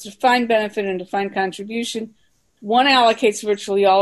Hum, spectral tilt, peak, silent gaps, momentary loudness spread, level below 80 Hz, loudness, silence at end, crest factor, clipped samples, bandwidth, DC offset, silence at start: none; -3.5 dB/octave; -4 dBFS; none; 12 LU; -66 dBFS; -18 LUFS; 0 s; 14 dB; under 0.1%; 12.5 kHz; under 0.1%; 0 s